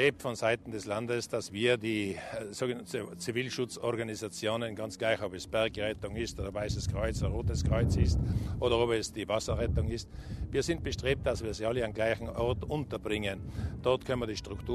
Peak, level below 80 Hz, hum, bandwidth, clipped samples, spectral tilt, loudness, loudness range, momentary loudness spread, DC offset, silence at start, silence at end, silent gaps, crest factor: -12 dBFS; -42 dBFS; none; 13.5 kHz; under 0.1%; -5.5 dB/octave; -33 LUFS; 3 LU; 8 LU; under 0.1%; 0 s; 0 s; none; 20 dB